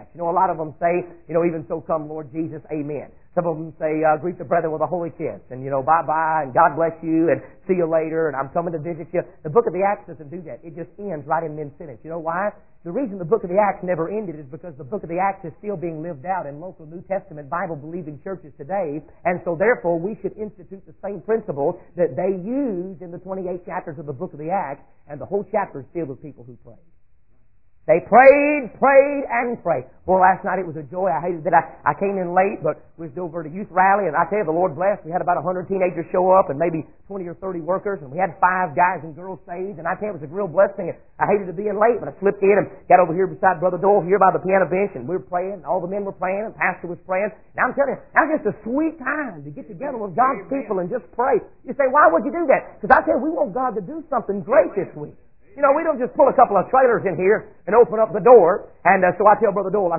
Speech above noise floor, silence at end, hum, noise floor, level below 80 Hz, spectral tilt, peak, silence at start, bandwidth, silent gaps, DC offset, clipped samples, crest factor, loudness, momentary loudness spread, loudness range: 39 dB; 0 s; none; -59 dBFS; -54 dBFS; -12 dB/octave; 0 dBFS; 0 s; 2.9 kHz; none; 0.4%; under 0.1%; 20 dB; -20 LUFS; 16 LU; 10 LU